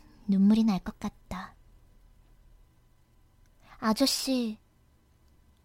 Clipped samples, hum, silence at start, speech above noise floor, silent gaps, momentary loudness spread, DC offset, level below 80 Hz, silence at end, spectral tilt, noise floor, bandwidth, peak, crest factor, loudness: under 0.1%; none; 0.25 s; 38 dB; none; 18 LU; under 0.1%; -56 dBFS; 1.1 s; -5 dB/octave; -64 dBFS; 16.5 kHz; -12 dBFS; 20 dB; -27 LUFS